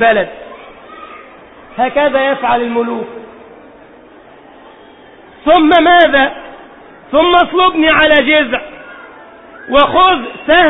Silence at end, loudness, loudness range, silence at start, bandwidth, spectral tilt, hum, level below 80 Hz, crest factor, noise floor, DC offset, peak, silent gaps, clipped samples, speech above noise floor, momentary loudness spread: 0 s; -10 LUFS; 8 LU; 0 s; 4 kHz; -6.5 dB/octave; none; -42 dBFS; 12 dB; -39 dBFS; under 0.1%; 0 dBFS; none; under 0.1%; 29 dB; 25 LU